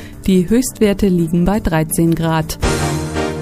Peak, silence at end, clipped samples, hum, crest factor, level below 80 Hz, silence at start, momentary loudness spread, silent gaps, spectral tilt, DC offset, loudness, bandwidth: 0 dBFS; 0 s; under 0.1%; none; 16 dB; -28 dBFS; 0 s; 5 LU; none; -6 dB/octave; under 0.1%; -16 LUFS; 15.5 kHz